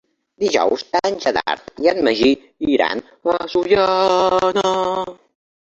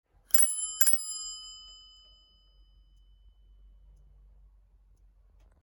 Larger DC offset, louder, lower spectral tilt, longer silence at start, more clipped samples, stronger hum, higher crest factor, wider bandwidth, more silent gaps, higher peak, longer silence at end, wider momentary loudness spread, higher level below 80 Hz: neither; first, -18 LUFS vs -24 LUFS; first, -4 dB/octave vs 2.5 dB/octave; about the same, 0.4 s vs 0.35 s; neither; neither; second, 16 dB vs 28 dB; second, 8 kHz vs 19 kHz; neither; first, -2 dBFS vs -6 dBFS; second, 0.55 s vs 3.9 s; second, 7 LU vs 25 LU; first, -52 dBFS vs -60 dBFS